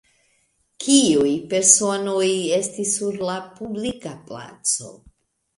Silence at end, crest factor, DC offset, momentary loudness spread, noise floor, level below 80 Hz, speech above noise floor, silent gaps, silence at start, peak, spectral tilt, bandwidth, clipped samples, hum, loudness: 0.6 s; 22 dB; under 0.1%; 17 LU; -66 dBFS; -60 dBFS; 45 dB; none; 0.8 s; 0 dBFS; -2.5 dB/octave; 11.5 kHz; under 0.1%; none; -19 LUFS